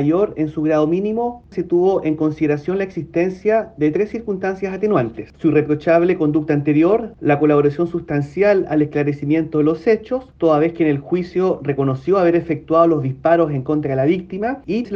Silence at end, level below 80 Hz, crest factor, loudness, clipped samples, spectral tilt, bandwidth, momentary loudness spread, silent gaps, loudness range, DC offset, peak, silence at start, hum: 0 s; -50 dBFS; 16 dB; -18 LUFS; under 0.1%; -9 dB/octave; 6.6 kHz; 7 LU; none; 3 LU; under 0.1%; -2 dBFS; 0 s; none